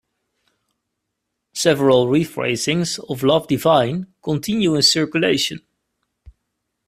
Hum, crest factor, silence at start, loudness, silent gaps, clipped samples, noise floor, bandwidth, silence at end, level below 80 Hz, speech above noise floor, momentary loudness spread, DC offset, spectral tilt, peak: none; 18 dB; 1.55 s; -18 LUFS; none; under 0.1%; -78 dBFS; 16 kHz; 0.55 s; -56 dBFS; 60 dB; 10 LU; under 0.1%; -4.5 dB/octave; -2 dBFS